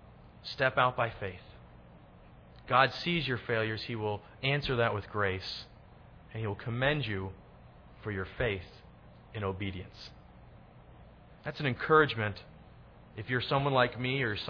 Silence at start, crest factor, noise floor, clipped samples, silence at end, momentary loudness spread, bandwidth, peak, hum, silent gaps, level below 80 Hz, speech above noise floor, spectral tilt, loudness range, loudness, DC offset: 0 s; 22 dB; -55 dBFS; under 0.1%; 0 s; 20 LU; 5.4 kHz; -10 dBFS; 60 Hz at -60 dBFS; none; -56 dBFS; 23 dB; -7 dB/octave; 8 LU; -31 LUFS; under 0.1%